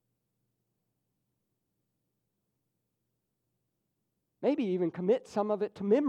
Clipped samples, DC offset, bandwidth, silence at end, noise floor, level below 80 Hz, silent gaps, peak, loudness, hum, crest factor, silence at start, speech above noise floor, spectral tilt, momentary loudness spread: under 0.1%; under 0.1%; 9.2 kHz; 0 s; -83 dBFS; -82 dBFS; none; -14 dBFS; -31 LUFS; none; 20 dB; 4.4 s; 54 dB; -8 dB/octave; 4 LU